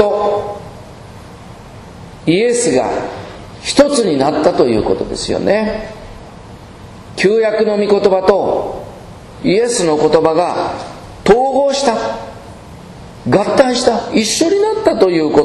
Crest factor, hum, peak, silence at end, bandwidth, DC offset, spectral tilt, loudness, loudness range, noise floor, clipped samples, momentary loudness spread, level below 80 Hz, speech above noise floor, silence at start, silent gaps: 14 dB; none; 0 dBFS; 0 s; 12.5 kHz; under 0.1%; -4.5 dB/octave; -14 LUFS; 3 LU; -34 dBFS; 0.2%; 23 LU; -40 dBFS; 21 dB; 0 s; none